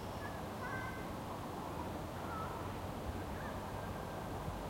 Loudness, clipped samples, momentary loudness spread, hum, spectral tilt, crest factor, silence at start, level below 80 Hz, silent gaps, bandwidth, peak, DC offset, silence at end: -44 LUFS; under 0.1%; 2 LU; none; -6 dB/octave; 14 dB; 0 s; -54 dBFS; none; 16.5 kHz; -30 dBFS; under 0.1%; 0 s